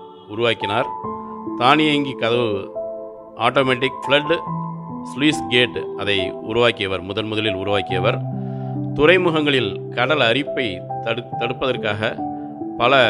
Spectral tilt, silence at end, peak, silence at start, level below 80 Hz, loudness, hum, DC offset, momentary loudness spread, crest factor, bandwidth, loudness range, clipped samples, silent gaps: -5.5 dB/octave; 0 s; 0 dBFS; 0 s; -52 dBFS; -20 LUFS; none; under 0.1%; 13 LU; 20 dB; 11.5 kHz; 2 LU; under 0.1%; none